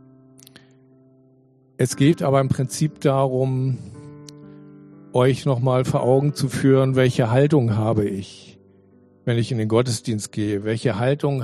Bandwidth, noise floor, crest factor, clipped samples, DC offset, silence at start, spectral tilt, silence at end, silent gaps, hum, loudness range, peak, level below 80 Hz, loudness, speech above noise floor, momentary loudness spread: 13 kHz; -56 dBFS; 16 dB; under 0.1%; under 0.1%; 1.8 s; -6.5 dB/octave; 0 s; none; none; 5 LU; -4 dBFS; -56 dBFS; -20 LUFS; 36 dB; 12 LU